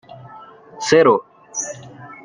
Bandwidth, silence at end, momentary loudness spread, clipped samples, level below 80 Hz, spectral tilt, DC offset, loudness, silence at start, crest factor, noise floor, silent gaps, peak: 10 kHz; 0.1 s; 24 LU; under 0.1%; -62 dBFS; -3.5 dB/octave; under 0.1%; -18 LUFS; 0.1 s; 18 dB; -41 dBFS; none; -2 dBFS